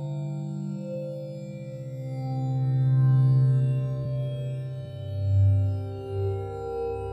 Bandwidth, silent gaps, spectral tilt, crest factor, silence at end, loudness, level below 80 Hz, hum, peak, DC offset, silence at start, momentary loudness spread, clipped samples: 5 kHz; none; -10 dB/octave; 12 dB; 0 s; -27 LUFS; -52 dBFS; none; -14 dBFS; under 0.1%; 0 s; 15 LU; under 0.1%